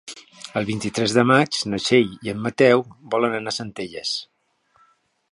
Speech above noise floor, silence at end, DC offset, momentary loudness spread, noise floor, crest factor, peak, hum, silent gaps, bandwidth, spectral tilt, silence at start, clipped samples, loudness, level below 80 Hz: 42 dB; 1.05 s; under 0.1%; 12 LU; -62 dBFS; 22 dB; 0 dBFS; none; none; 11.5 kHz; -4.5 dB/octave; 0.05 s; under 0.1%; -21 LUFS; -60 dBFS